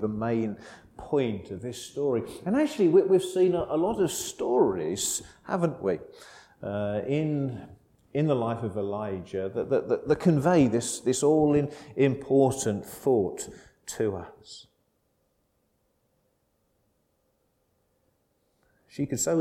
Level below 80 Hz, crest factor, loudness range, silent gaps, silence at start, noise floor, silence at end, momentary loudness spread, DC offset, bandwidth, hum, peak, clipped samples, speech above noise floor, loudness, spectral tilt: -60 dBFS; 18 dB; 9 LU; none; 0 s; -72 dBFS; 0 s; 16 LU; under 0.1%; 16.5 kHz; none; -10 dBFS; under 0.1%; 46 dB; -27 LUFS; -5.5 dB/octave